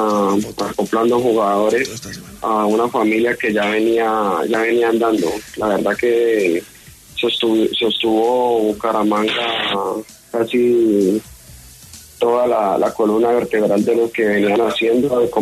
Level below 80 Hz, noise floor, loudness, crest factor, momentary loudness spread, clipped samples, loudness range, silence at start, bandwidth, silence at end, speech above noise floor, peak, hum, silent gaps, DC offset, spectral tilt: -52 dBFS; -40 dBFS; -17 LUFS; 12 dB; 7 LU; under 0.1%; 2 LU; 0 s; 13.5 kHz; 0 s; 24 dB; -4 dBFS; none; none; under 0.1%; -5 dB/octave